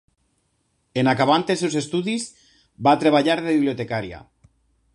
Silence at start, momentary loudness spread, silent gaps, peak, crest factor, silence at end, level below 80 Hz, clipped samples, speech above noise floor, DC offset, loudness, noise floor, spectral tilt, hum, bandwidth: 0.95 s; 12 LU; none; -4 dBFS; 18 dB; 0.75 s; -58 dBFS; under 0.1%; 49 dB; under 0.1%; -21 LUFS; -69 dBFS; -5 dB/octave; none; 11.5 kHz